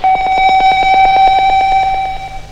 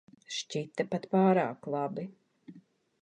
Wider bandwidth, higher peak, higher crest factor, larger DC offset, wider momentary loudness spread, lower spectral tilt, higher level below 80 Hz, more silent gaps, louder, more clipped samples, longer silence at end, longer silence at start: second, 8.4 kHz vs 9.6 kHz; first, 0 dBFS vs -14 dBFS; second, 10 dB vs 20 dB; neither; second, 9 LU vs 13 LU; second, -3 dB/octave vs -6 dB/octave; first, -28 dBFS vs -78 dBFS; neither; first, -10 LUFS vs -31 LUFS; neither; second, 0 s vs 0.4 s; second, 0 s vs 0.3 s